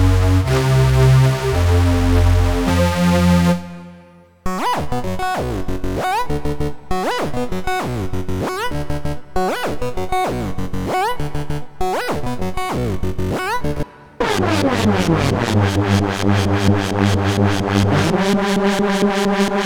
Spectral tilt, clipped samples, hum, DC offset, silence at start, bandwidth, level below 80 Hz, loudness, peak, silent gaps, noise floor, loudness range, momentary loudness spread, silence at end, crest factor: -6 dB/octave; under 0.1%; none; under 0.1%; 0 s; 19.5 kHz; -28 dBFS; -18 LUFS; -2 dBFS; none; -45 dBFS; 7 LU; 10 LU; 0 s; 14 dB